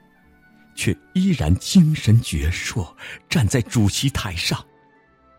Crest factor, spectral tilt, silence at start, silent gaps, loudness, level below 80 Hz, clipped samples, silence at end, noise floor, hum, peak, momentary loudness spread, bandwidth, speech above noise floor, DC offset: 16 dB; -5 dB/octave; 0.75 s; none; -20 LUFS; -36 dBFS; under 0.1%; 0.75 s; -55 dBFS; none; -6 dBFS; 13 LU; 16.5 kHz; 36 dB; under 0.1%